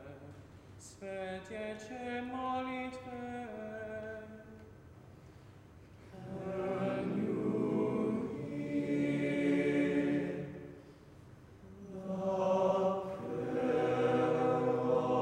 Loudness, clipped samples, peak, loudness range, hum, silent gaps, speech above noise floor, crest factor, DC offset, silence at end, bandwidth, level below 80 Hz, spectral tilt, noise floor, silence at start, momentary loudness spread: -35 LUFS; under 0.1%; -20 dBFS; 11 LU; none; none; 15 dB; 16 dB; under 0.1%; 0 s; 11 kHz; -66 dBFS; -7.5 dB/octave; -56 dBFS; 0 s; 23 LU